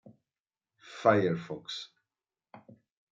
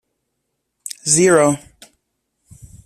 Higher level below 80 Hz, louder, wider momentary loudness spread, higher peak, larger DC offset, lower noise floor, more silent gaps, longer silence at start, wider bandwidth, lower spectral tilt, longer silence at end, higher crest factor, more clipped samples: second, -78 dBFS vs -54 dBFS; second, -30 LUFS vs -15 LUFS; about the same, 22 LU vs 20 LU; second, -8 dBFS vs -2 dBFS; neither; first, under -90 dBFS vs -74 dBFS; first, 0.40-0.45 s vs none; second, 0.05 s vs 1.05 s; second, 7.8 kHz vs 14 kHz; first, -6 dB/octave vs -3.5 dB/octave; second, 0.55 s vs 1.3 s; first, 26 dB vs 18 dB; neither